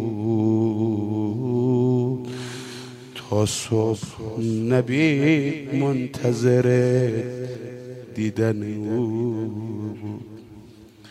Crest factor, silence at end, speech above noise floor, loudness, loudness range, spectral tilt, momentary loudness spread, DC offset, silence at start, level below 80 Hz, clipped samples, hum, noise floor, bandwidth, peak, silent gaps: 16 dB; 0 s; 24 dB; -23 LUFS; 6 LU; -6.5 dB/octave; 16 LU; under 0.1%; 0 s; -60 dBFS; under 0.1%; none; -46 dBFS; 13.5 kHz; -6 dBFS; none